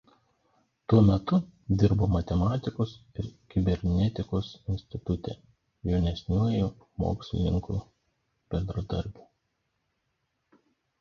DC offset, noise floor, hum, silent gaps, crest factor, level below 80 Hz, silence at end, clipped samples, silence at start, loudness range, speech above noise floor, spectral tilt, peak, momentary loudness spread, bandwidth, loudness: under 0.1%; -78 dBFS; none; none; 22 dB; -40 dBFS; 1.9 s; under 0.1%; 0.9 s; 8 LU; 51 dB; -9 dB/octave; -8 dBFS; 12 LU; 7 kHz; -29 LUFS